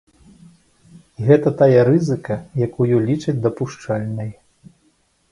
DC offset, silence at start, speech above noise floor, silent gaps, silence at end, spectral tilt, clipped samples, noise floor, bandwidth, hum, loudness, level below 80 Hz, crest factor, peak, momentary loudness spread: under 0.1%; 0.95 s; 44 dB; none; 1 s; -8.5 dB/octave; under 0.1%; -61 dBFS; 11 kHz; none; -18 LUFS; -54 dBFS; 18 dB; 0 dBFS; 13 LU